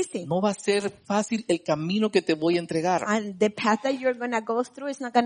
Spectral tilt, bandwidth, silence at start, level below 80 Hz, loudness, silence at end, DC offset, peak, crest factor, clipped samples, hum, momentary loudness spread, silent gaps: -5 dB/octave; 10 kHz; 0 s; -70 dBFS; -26 LUFS; 0 s; under 0.1%; -8 dBFS; 18 dB; under 0.1%; none; 4 LU; none